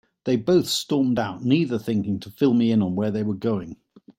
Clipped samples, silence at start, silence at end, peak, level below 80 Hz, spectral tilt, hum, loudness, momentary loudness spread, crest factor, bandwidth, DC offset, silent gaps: under 0.1%; 0.25 s; 0.45 s; -6 dBFS; -60 dBFS; -6 dB/octave; none; -23 LUFS; 6 LU; 16 dB; 16.5 kHz; under 0.1%; none